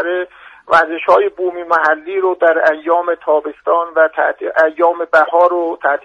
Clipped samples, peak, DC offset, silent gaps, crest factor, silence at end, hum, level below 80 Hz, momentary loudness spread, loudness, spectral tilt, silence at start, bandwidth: under 0.1%; 0 dBFS; under 0.1%; none; 14 dB; 0.05 s; none; -62 dBFS; 5 LU; -14 LUFS; -4.5 dB/octave; 0 s; 8.2 kHz